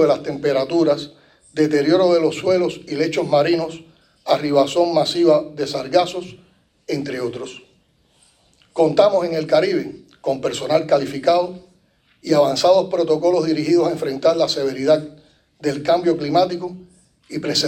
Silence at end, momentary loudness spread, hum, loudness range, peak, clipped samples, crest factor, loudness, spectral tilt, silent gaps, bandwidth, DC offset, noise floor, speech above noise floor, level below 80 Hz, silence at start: 0 s; 14 LU; none; 4 LU; -2 dBFS; under 0.1%; 18 dB; -18 LUFS; -5 dB/octave; none; 16 kHz; under 0.1%; -59 dBFS; 41 dB; -60 dBFS; 0 s